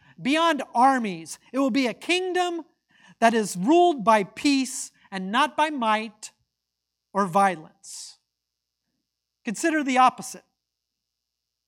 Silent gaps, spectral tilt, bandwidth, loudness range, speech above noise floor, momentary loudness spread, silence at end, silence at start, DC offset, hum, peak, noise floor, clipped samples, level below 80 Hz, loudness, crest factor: none; -4 dB/octave; 17 kHz; 6 LU; 60 dB; 18 LU; 1.3 s; 0.2 s; under 0.1%; none; -4 dBFS; -83 dBFS; under 0.1%; -76 dBFS; -23 LUFS; 20 dB